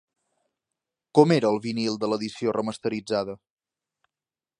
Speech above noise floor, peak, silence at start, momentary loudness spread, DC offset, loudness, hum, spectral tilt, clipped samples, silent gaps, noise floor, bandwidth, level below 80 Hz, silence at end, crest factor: over 66 dB; -2 dBFS; 1.15 s; 10 LU; under 0.1%; -25 LUFS; none; -6 dB/octave; under 0.1%; none; under -90 dBFS; 11 kHz; -68 dBFS; 1.25 s; 24 dB